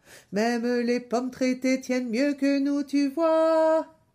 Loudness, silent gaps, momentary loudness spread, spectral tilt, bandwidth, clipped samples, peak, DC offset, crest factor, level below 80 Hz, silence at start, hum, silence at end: -25 LUFS; none; 6 LU; -5 dB/octave; 15 kHz; under 0.1%; -12 dBFS; under 0.1%; 12 dB; -72 dBFS; 0.1 s; none; 0.3 s